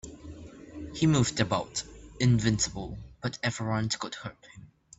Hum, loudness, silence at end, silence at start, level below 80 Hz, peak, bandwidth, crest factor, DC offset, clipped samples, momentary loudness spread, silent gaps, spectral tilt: none; -29 LUFS; 0.3 s; 0.05 s; -50 dBFS; -10 dBFS; 8.4 kHz; 20 dB; under 0.1%; under 0.1%; 21 LU; none; -4.5 dB/octave